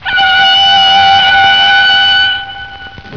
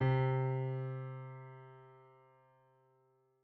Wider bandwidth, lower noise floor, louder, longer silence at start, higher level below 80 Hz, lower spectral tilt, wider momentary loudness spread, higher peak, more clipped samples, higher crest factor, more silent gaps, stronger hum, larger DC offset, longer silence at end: first, 5.4 kHz vs 4.5 kHz; second, -28 dBFS vs -74 dBFS; first, -5 LUFS vs -37 LUFS; about the same, 0 s vs 0 s; first, -40 dBFS vs -66 dBFS; second, -1 dB/octave vs -7.5 dB/octave; second, 15 LU vs 23 LU; first, 0 dBFS vs -22 dBFS; neither; second, 8 dB vs 16 dB; neither; neither; first, 0.8% vs under 0.1%; second, 0 s vs 1.45 s